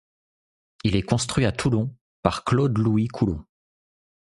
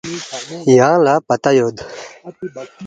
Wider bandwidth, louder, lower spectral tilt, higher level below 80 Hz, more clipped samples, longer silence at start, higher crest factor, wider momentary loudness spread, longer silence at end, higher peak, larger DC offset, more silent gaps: first, 11.5 kHz vs 9.2 kHz; second, -24 LUFS vs -14 LUFS; about the same, -6 dB/octave vs -5.5 dB/octave; first, -44 dBFS vs -56 dBFS; neither; first, 0.85 s vs 0.05 s; first, 24 dB vs 16 dB; second, 6 LU vs 20 LU; first, 0.95 s vs 0 s; about the same, -2 dBFS vs 0 dBFS; neither; first, 2.01-2.23 s vs none